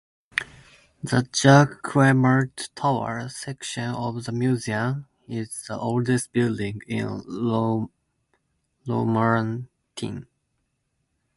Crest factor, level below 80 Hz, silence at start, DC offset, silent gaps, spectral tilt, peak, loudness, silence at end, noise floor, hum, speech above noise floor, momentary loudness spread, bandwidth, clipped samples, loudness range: 22 dB; -58 dBFS; 0.35 s; under 0.1%; none; -6 dB/octave; -4 dBFS; -24 LUFS; 1.15 s; -74 dBFS; none; 51 dB; 16 LU; 11.5 kHz; under 0.1%; 7 LU